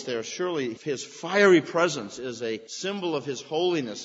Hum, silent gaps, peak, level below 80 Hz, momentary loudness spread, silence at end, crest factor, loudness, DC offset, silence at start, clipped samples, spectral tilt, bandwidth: none; none; -6 dBFS; -76 dBFS; 14 LU; 0 s; 20 dB; -26 LUFS; under 0.1%; 0 s; under 0.1%; -4 dB/octave; 8 kHz